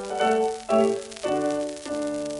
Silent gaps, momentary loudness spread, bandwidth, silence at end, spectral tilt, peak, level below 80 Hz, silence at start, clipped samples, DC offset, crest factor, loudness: none; 8 LU; 11.5 kHz; 0 s; -4 dB/octave; -10 dBFS; -60 dBFS; 0 s; under 0.1%; under 0.1%; 16 dB; -25 LUFS